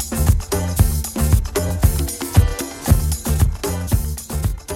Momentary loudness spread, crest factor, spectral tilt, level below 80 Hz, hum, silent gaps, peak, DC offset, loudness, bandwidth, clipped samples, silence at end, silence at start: 6 LU; 18 dB; -5.5 dB/octave; -22 dBFS; none; none; 0 dBFS; under 0.1%; -20 LUFS; 17 kHz; under 0.1%; 0 s; 0 s